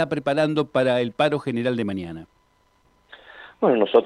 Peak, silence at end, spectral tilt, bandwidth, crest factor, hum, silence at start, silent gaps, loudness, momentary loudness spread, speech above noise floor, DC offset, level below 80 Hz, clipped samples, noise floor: -4 dBFS; 0 s; -7 dB/octave; 11 kHz; 18 dB; none; 0 s; none; -22 LUFS; 17 LU; 41 dB; under 0.1%; -64 dBFS; under 0.1%; -62 dBFS